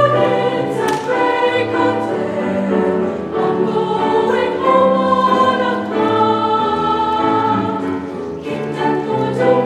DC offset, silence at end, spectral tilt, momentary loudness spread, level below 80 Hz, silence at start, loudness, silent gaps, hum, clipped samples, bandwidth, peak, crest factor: under 0.1%; 0 s; -6.5 dB/octave; 7 LU; -56 dBFS; 0 s; -16 LUFS; none; none; under 0.1%; 13 kHz; 0 dBFS; 14 dB